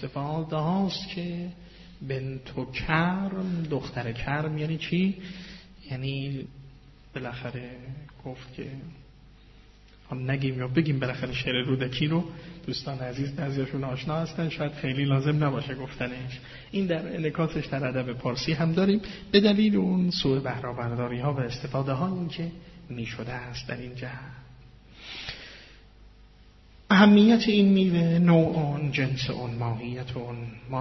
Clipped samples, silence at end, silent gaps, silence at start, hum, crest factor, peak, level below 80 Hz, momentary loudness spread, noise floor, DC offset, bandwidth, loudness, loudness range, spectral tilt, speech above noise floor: under 0.1%; 0 s; none; 0 s; none; 22 dB; -6 dBFS; -52 dBFS; 19 LU; -53 dBFS; under 0.1%; 6.2 kHz; -27 LUFS; 16 LU; -5.5 dB/octave; 27 dB